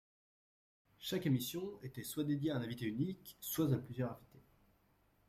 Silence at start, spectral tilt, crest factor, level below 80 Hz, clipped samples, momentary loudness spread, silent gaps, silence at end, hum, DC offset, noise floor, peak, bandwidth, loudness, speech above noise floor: 1 s; -6 dB/octave; 18 dB; -70 dBFS; under 0.1%; 11 LU; none; 0.9 s; none; under 0.1%; -74 dBFS; -22 dBFS; 16 kHz; -40 LUFS; 35 dB